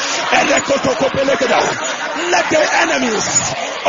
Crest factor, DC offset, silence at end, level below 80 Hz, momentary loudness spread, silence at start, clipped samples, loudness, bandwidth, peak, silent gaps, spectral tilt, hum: 16 dB; under 0.1%; 0 s; -50 dBFS; 6 LU; 0 s; under 0.1%; -14 LUFS; 7.6 kHz; 0 dBFS; none; -2 dB/octave; none